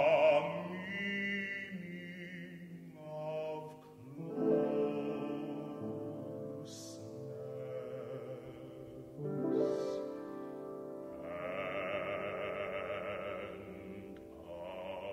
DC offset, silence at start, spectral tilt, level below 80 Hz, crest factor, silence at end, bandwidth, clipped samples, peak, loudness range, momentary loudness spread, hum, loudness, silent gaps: under 0.1%; 0 s; -6 dB/octave; -72 dBFS; 20 dB; 0 s; 15.5 kHz; under 0.1%; -18 dBFS; 6 LU; 16 LU; none; -39 LUFS; none